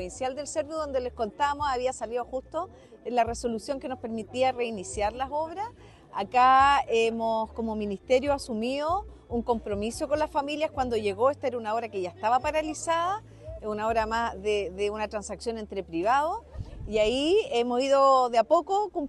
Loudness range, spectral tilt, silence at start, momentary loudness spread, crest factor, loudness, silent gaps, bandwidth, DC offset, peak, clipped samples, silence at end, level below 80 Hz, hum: 6 LU; -4 dB/octave; 0 s; 12 LU; 16 dB; -27 LUFS; none; 12 kHz; under 0.1%; -10 dBFS; under 0.1%; 0 s; -50 dBFS; none